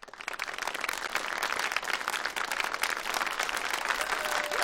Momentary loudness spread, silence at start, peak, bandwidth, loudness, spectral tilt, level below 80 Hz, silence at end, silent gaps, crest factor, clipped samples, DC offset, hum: 4 LU; 0 s; -8 dBFS; 16.5 kHz; -31 LUFS; 0.5 dB/octave; -62 dBFS; 0 s; none; 24 dB; under 0.1%; under 0.1%; none